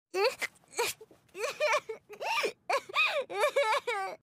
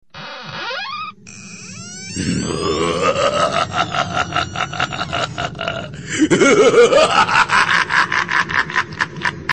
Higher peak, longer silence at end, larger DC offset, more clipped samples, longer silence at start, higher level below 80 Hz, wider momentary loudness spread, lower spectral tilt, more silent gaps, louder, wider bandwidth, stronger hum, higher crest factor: second, -16 dBFS vs -2 dBFS; about the same, 0.05 s vs 0 s; second, under 0.1% vs 0.3%; neither; about the same, 0.15 s vs 0.15 s; second, -80 dBFS vs -46 dBFS; second, 11 LU vs 19 LU; second, -0.5 dB/octave vs -3.5 dB/octave; neither; second, -31 LUFS vs -16 LUFS; first, 15.5 kHz vs 10 kHz; neither; about the same, 18 dB vs 16 dB